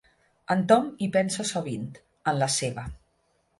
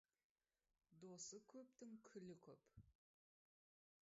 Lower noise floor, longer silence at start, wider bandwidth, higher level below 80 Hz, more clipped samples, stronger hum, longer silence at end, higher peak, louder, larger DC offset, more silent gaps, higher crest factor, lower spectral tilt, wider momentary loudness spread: second, -70 dBFS vs under -90 dBFS; second, 0.5 s vs 0.9 s; first, 11.5 kHz vs 7.6 kHz; first, -54 dBFS vs -88 dBFS; neither; neither; second, 0.65 s vs 1.2 s; first, -6 dBFS vs -46 dBFS; first, -26 LUFS vs -61 LUFS; neither; neither; about the same, 22 dB vs 20 dB; second, -4.5 dB/octave vs -6 dB/octave; first, 15 LU vs 10 LU